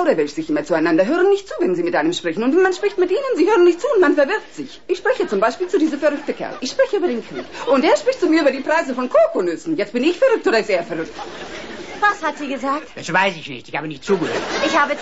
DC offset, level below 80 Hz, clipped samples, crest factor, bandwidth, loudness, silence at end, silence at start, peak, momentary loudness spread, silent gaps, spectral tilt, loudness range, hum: 0.7%; -58 dBFS; under 0.1%; 14 dB; 8 kHz; -18 LUFS; 0 s; 0 s; -4 dBFS; 11 LU; none; -4.5 dB/octave; 4 LU; none